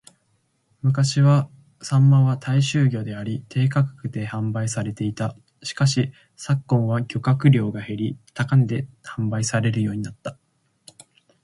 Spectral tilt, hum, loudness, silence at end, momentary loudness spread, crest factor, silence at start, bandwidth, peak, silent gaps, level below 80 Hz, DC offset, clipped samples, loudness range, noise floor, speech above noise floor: -6.5 dB/octave; none; -22 LUFS; 1.1 s; 13 LU; 18 dB; 0.85 s; 11.5 kHz; -4 dBFS; none; -58 dBFS; under 0.1%; under 0.1%; 5 LU; -67 dBFS; 47 dB